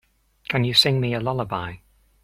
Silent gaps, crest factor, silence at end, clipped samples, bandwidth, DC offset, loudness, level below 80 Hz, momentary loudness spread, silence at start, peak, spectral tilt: none; 20 dB; 0.45 s; under 0.1%; 15.5 kHz; under 0.1%; -21 LUFS; -52 dBFS; 16 LU; 0.5 s; -4 dBFS; -5 dB/octave